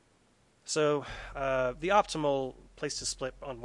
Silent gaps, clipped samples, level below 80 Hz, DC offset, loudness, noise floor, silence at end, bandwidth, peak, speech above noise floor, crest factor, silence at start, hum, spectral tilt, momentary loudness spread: none; under 0.1%; -54 dBFS; under 0.1%; -31 LUFS; -67 dBFS; 0 s; 11.5 kHz; -10 dBFS; 36 dB; 22 dB; 0.65 s; none; -3.5 dB/octave; 13 LU